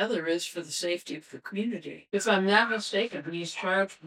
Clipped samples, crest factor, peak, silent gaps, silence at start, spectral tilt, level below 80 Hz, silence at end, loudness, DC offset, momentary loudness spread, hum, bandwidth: under 0.1%; 22 dB; -6 dBFS; none; 0 s; -3.5 dB/octave; -82 dBFS; 0 s; -28 LUFS; under 0.1%; 13 LU; none; 16 kHz